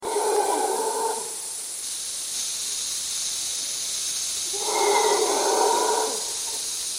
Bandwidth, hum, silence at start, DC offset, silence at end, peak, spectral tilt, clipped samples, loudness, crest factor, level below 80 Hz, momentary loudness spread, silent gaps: 16.5 kHz; none; 0 s; under 0.1%; 0 s; -8 dBFS; 0.5 dB/octave; under 0.1%; -24 LUFS; 16 dB; -64 dBFS; 8 LU; none